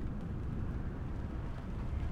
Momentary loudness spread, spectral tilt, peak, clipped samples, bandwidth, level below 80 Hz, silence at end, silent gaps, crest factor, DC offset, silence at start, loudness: 2 LU; -9 dB/octave; -26 dBFS; under 0.1%; 8.4 kHz; -42 dBFS; 0 s; none; 10 dB; under 0.1%; 0 s; -41 LUFS